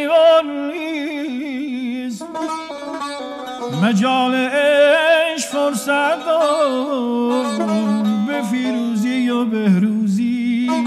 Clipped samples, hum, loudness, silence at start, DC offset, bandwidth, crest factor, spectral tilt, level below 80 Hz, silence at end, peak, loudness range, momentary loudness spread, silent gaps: under 0.1%; none; -18 LUFS; 0 s; under 0.1%; 14 kHz; 14 dB; -5 dB/octave; -66 dBFS; 0 s; -4 dBFS; 6 LU; 13 LU; none